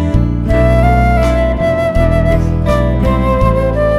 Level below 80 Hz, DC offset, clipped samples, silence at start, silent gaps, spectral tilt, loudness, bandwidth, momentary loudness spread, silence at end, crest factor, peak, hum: -16 dBFS; under 0.1%; under 0.1%; 0 s; none; -8 dB/octave; -12 LUFS; 12 kHz; 3 LU; 0 s; 10 dB; 0 dBFS; none